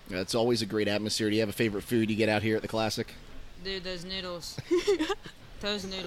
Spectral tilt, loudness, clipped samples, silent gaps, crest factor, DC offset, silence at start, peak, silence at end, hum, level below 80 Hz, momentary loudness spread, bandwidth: -4.5 dB/octave; -30 LUFS; under 0.1%; none; 18 dB; under 0.1%; 0 s; -12 dBFS; 0 s; none; -52 dBFS; 11 LU; 16 kHz